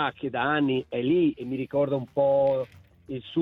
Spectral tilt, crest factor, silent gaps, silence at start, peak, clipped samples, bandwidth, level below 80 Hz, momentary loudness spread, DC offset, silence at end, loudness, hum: -9 dB/octave; 14 dB; none; 0 s; -12 dBFS; under 0.1%; 4.7 kHz; -62 dBFS; 11 LU; under 0.1%; 0 s; -26 LUFS; none